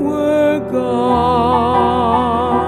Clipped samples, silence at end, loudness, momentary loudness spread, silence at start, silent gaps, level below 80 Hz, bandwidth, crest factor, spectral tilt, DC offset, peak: under 0.1%; 0 s; -14 LUFS; 3 LU; 0 s; none; -36 dBFS; 14.5 kHz; 12 dB; -7 dB/octave; under 0.1%; -2 dBFS